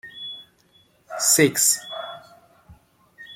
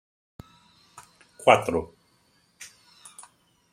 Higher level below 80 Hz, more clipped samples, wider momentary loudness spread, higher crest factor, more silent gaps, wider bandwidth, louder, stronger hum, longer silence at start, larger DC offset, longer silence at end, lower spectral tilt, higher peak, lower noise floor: about the same, -64 dBFS vs -62 dBFS; neither; second, 22 LU vs 27 LU; second, 22 dB vs 28 dB; neither; about the same, 16.5 kHz vs 15.5 kHz; first, -18 LUFS vs -22 LUFS; neither; second, 0.05 s vs 1.45 s; neither; second, 0 s vs 1.05 s; second, -2 dB/octave vs -4 dB/octave; about the same, -4 dBFS vs -2 dBFS; second, -59 dBFS vs -65 dBFS